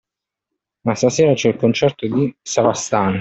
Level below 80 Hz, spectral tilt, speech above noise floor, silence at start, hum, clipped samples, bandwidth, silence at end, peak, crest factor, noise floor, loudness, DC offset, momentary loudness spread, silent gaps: -56 dBFS; -5 dB/octave; 66 dB; 0.85 s; none; under 0.1%; 8.2 kHz; 0 s; -2 dBFS; 16 dB; -83 dBFS; -17 LUFS; under 0.1%; 6 LU; none